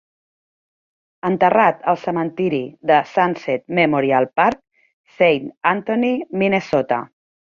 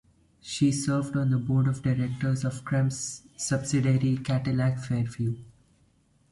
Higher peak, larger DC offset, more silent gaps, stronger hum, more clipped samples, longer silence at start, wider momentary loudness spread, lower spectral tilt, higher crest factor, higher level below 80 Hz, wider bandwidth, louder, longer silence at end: first, -2 dBFS vs -12 dBFS; neither; first, 4.93-5.04 s vs none; neither; neither; first, 1.25 s vs 0.45 s; about the same, 8 LU vs 9 LU; about the same, -7 dB/octave vs -6 dB/octave; about the same, 18 dB vs 16 dB; about the same, -60 dBFS vs -56 dBFS; second, 7.2 kHz vs 11.5 kHz; first, -18 LUFS vs -27 LUFS; second, 0.5 s vs 0.8 s